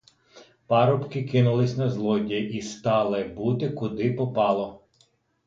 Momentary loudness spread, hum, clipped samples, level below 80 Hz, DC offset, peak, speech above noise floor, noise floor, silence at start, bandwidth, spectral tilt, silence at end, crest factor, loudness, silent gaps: 7 LU; none; under 0.1%; -60 dBFS; under 0.1%; -8 dBFS; 41 dB; -65 dBFS; 0.35 s; 7.6 kHz; -7.5 dB/octave; 0.7 s; 18 dB; -25 LUFS; none